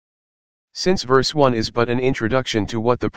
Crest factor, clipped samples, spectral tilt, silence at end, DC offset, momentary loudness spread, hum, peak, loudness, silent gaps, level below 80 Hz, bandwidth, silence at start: 18 dB; under 0.1%; -5.5 dB/octave; 0 s; 2%; 5 LU; none; 0 dBFS; -19 LUFS; none; -42 dBFS; 9.6 kHz; 0.65 s